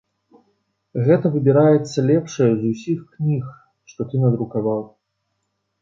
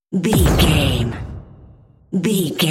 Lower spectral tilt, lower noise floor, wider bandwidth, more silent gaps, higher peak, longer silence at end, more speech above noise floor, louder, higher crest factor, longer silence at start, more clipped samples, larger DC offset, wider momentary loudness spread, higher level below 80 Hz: first, -8.5 dB/octave vs -5 dB/octave; first, -74 dBFS vs -46 dBFS; second, 7.6 kHz vs 16.5 kHz; neither; about the same, -2 dBFS vs -2 dBFS; first, 0.95 s vs 0 s; first, 55 dB vs 30 dB; about the same, -19 LUFS vs -17 LUFS; about the same, 18 dB vs 16 dB; first, 0.95 s vs 0.1 s; neither; neither; second, 12 LU vs 17 LU; second, -60 dBFS vs -26 dBFS